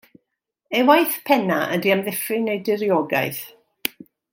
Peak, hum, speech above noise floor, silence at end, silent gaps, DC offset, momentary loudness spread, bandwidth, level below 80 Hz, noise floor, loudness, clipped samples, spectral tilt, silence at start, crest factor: 0 dBFS; none; 58 dB; 0.45 s; none; under 0.1%; 13 LU; 17 kHz; -70 dBFS; -78 dBFS; -20 LUFS; under 0.1%; -4.5 dB/octave; 0.7 s; 20 dB